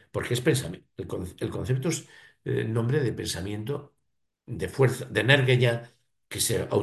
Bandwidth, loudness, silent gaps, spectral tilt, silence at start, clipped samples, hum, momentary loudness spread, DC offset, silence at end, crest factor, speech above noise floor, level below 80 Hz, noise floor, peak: 12.5 kHz; -27 LUFS; none; -5 dB/octave; 0.15 s; under 0.1%; none; 15 LU; under 0.1%; 0 s; 22 dB; 52 dB; -52 dBFS; -78 dBFS; -4 dBFS